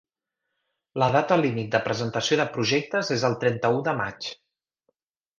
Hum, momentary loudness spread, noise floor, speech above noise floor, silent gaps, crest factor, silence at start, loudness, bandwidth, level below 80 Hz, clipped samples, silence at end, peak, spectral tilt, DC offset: none; 7 LU; -83 dBFS; 59 dB; none; 22 dB; 0.95 s; -24 LUFS; 9.8 kHz; -62 dBFS; under 0.1%; 1.05 s; -4 dBFS; -5 dB/octave; under 0.1%